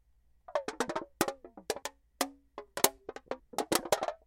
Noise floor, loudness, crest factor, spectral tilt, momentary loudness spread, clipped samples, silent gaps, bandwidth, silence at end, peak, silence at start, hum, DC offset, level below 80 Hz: -58 dBFS; -34 LUFS; 30 dB; -2 dB/octave; 15 LU; under 0.1%; none; 16.5 kHz; 0.1 s; -6 dBFS; 0.5 s; none; under 0.1%; -66 dBFS